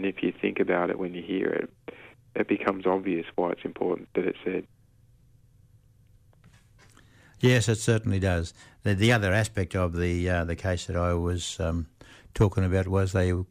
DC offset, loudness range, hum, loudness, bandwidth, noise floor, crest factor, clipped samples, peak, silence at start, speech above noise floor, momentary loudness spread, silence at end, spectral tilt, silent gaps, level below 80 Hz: under 0.1%; 8 LU; none; -27 LUFS; 15 kHz; -59 dBFS; 16 dB; under 0.1%; -10 dBFS; 0 s; 33 dB; 10 LU; 0.05 s; -6 dB/octave; none; -46 dBFS